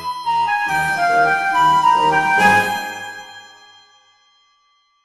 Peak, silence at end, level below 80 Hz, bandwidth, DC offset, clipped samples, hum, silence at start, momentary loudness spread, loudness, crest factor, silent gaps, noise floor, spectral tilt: -2 dBFS; 1.6 s; -54 dBFS; 15 kHz; under 0.1%; under 0.1%; none; 0 s; 16 LU; -15 LUFS; 16 dB; none; -60 dBFS; -3.5 dB/octave